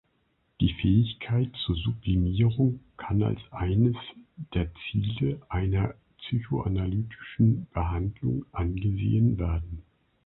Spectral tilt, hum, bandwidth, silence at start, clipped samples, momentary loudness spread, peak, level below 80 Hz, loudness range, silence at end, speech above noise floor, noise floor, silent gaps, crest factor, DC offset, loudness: -12 dB/octave; none; 4.1 kHz; 0.6 s; under 0.1%; 9 LU; -10 dBFS; -38 dBFS; 3 LU; 0.45 s; 45 dB; -71 dBFS; none; 16 dB; under 0.1%; -28 LUFS